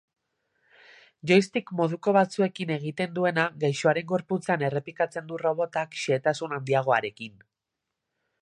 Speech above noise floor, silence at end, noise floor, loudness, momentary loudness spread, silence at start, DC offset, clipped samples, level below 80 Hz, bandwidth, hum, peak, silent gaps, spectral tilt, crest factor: 59 dB; 1.1 s; -85 dBFS; -26 LUFS; 8 LU; 1.25 s; under 0.1%; under 0.1%; -74 dBFS; 11 kHz; none; -6 dBFS; none; -6 dB/octave; 20 dB